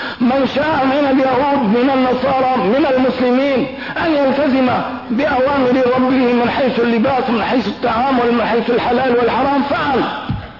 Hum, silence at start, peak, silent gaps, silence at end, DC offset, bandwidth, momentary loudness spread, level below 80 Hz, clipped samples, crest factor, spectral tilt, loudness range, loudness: none; 0 s; -6 dBFS; none; 0 s; 0.3%; 6 kHz; 4 LU; -44 dBFS; under 0.1%; 8 dB; -7.5 dB/octave; 1 LU; -15 LUFS